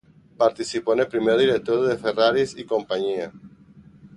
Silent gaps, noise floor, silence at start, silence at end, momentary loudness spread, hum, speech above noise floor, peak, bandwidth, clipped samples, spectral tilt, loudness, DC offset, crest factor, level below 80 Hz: none; -49 dBFS; 0.4 s; 0.1 s; 8 LU; none; 28 dB; -4 dBFS; 11.5 kHz; under 0.1%; -5 dB/octave; -22 LUFS; under 0.1%; 18 dB; -60 dBFS